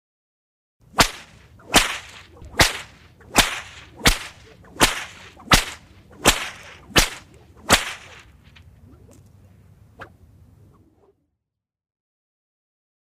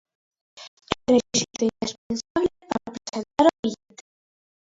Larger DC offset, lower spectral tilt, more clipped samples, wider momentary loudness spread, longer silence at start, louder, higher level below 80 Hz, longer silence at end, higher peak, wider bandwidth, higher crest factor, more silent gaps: neither; second, -2 dB/octave vs -3.5 dB/octave; neither; first, 22 LU vs 17 LU; first, 0.95 s vs 0.55 s; first, -20 LUFS vs -24 LUFS; first, -36 dBFS vs -56 dBFS; first, 3 s vs 0.9 s; about the same, -2 dBFS vs 0 dBFS; first, 15.5 kHz vs 8 kHz; about the same, 24 dB vs 26 dB; second, none vs 0.68-0.77 s, 1.98-2.10 s, 2.30-2.35 s, 3.59-3.63 s